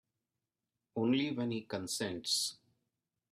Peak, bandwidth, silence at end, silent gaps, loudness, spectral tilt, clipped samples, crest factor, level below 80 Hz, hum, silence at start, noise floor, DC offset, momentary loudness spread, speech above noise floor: -20 dBFS; 15.5 kHz; 0.75 s; none; -35 LUFS; -3.5 dB/octave; under 0.1%; 18 dB; -78 dBFS; none; 0.95 s; under -90 dBFS; under 0.1%; 7 LU; over 55 dB